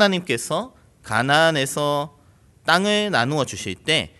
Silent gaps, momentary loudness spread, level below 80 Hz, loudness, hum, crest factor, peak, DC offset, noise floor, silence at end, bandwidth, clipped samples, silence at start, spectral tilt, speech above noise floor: none; 11 LU; -56 dBFS; -21 LUFS; none; 20 dB; 0 dBFS; under 0.1%; -54 dBFS; 0.1 s; 12.5 kHz; under 0.1%; 0 s; -3.5 dB/octave; 33 dB